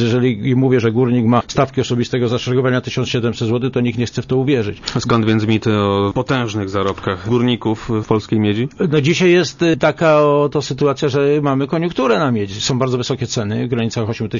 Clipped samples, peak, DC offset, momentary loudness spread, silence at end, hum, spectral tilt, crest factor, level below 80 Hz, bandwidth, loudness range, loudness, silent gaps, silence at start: under 0.1%; 0 dBFS; under 0.1%; 6 LU; 0 s; none; -6 dB/octave; 16 dB; -46 dBFS; 7.4 kHz; 3 LU; -16 LUFS; none; 0 s